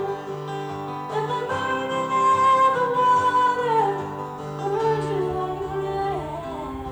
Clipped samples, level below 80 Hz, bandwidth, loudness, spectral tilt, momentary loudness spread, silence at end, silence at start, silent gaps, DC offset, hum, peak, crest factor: under 0.1%; -50 dBFS; over 20 kHz; -23 LUFS; -5.5 dB/octave; 13 LU; 0 s; 0 s; none; under 0.1%; none; -10 dBFS; 12 dB